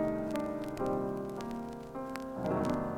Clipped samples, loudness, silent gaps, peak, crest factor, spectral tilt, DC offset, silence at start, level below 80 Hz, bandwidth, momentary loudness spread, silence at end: under 0.1%; -36 LUFS; none; -18 dBFS; 16 dB; -7 dB/octave; under 0.1%; 0 s; -56 dBFS; 17.5 kHz; 8 LU; 0 s